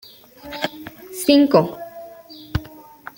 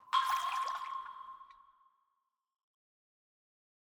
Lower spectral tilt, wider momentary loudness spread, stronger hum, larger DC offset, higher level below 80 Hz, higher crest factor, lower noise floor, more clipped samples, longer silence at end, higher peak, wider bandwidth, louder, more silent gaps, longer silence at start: first, -5.5 dB/octave vs 2 dB/octave; first, 25 LU vs 19 LU; neither; neither; first, -44 dBFS vs -82 dBFS; about the same, 20 dB vs 22 dB; second, -41 dBFS vs -84 dBFS; neither; second, 0.55 s vs 2.3 s; first, -2 dBFS vs -18 dBFS; second, 17 kHz vs over 20 kHz; first, -19 LUFS vs -36 LUFS; neither; first, 0.45 s vs 0.05 s